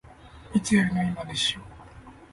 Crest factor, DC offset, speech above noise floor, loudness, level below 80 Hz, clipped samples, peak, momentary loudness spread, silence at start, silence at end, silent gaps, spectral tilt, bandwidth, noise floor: 18 dB; under 0.1%; 22 dB; -25 LUFS; -50 dBFS; under 0.1%; -10 dBFS; 13 LU; 0.05 s; 0.05 s; none; -4.5 dB/octave; 11.5 kHz; -48 dBFS